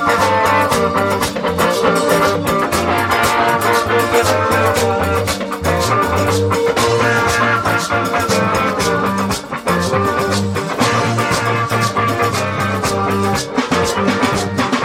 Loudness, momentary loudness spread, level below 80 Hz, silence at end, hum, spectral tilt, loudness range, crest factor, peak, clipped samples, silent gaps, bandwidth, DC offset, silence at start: -15 LUFS; 4 LU; -42 dBFS; 0 s; none; -4.5 dB/octave; 2 LU; 16 dB; 0 dBFS; under 0.1%; none; 16.5 kHz; under 0.1%; 0 s